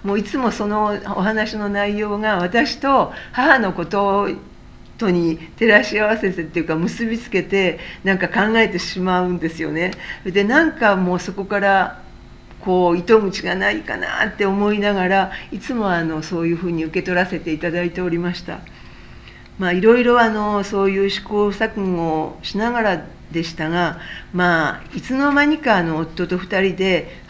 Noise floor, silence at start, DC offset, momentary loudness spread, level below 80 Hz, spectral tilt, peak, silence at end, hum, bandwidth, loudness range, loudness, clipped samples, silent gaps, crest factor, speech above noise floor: -40 dBFS; 0 s; under 0.1%; 9 LU; -44 dBFS; -6 dB/octave; 0 dBFS; 0 s; none; 8 kHz; 3 LU; -19 LUFS; under 0.1%; none; 18 dB; 21 dB